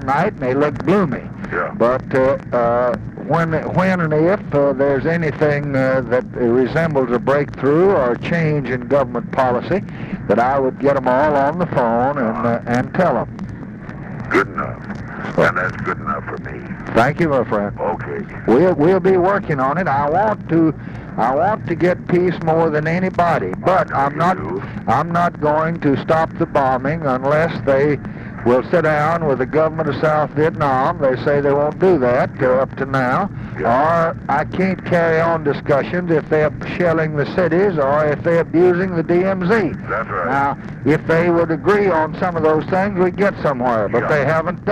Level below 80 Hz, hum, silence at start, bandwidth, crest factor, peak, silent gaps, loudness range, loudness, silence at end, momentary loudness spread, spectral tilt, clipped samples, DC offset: -42 dBFS; none; 0 s; 10.5 kHz; 10 dB; -6 dBFS; none; 3 LU; -17 LUFS; 0 s; 7 LU; -8 dB/octave; under 0.1%; under 0.1%